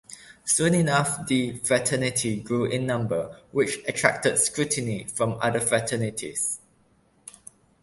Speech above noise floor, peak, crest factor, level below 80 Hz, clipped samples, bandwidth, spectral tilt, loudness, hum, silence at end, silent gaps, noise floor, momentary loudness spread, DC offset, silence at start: 38 dB; -2 dBFS; 24 dB; -58 dBFS; under 0.1%; 12 kHz; -4 dB/octave; -24 LUFS; none; 1.25 s; none; -62 dBFS; 9 LU; under 0.1%; 0.1 s